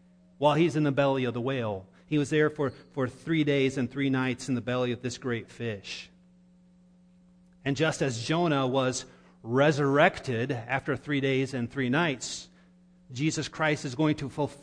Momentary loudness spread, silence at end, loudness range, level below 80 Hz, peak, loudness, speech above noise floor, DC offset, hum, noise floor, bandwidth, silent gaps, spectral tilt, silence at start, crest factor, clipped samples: 11 LU; 0.05 s; 7 LU; -62 dBFS; -8 dBFS; -28 LUFS; 31 dB; under 0.1%; none; -59 dBFS; 10.5 kHz; none; -5.5 dB/octave; 0.4 s; 22 dB; under 0.1%